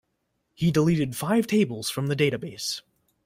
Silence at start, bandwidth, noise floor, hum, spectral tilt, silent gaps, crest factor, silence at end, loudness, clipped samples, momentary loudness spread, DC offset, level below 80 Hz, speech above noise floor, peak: 0.6 s; 16 kHz; -76 dBFS; none; -5.5 dB/octave; none; 16 dB; 0.45 s; -25 LUFS; under 0.1%; 9 LU; under 0.1%; -58 dBFS; 51 dB; -10 dBFS